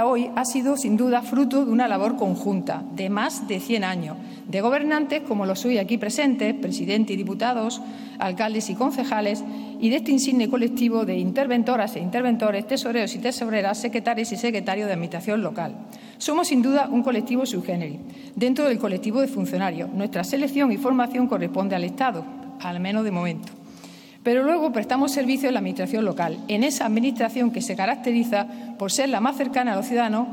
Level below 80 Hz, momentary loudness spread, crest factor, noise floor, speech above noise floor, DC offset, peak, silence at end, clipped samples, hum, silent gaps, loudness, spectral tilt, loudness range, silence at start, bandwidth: -70 dBFS; 9 LU; 16 dB; -44 dBFS; 21 dB; under 0.1%; -8 dBFS; 0 s; under 0.1%; none; none; -23 LUFS; -5 dB/octave; 2 LU; 0 s; 18 kHz